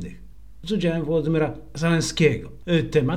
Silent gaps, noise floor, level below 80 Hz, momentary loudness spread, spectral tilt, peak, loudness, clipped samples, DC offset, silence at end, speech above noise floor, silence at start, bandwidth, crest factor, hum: none; -45 dBFS; -44 dBFS; 9 LU; -6 dB/octave; -6 dBFS; -23 LUFS; under 0.1%; 0.8%; 0 s; 23 dB; 0 s; 13.5 kHz; 18 dB; none